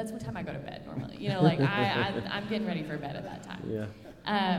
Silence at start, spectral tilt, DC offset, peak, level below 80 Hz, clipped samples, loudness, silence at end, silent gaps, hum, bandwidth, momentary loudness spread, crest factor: 0 s; -7 dB/octave; under 0.1%; -12 dBFS; -58 dBFS; under 0.1%; -32 LUFS; 0 s; none; none; 14.5 kHz; 14 LU; 20 dB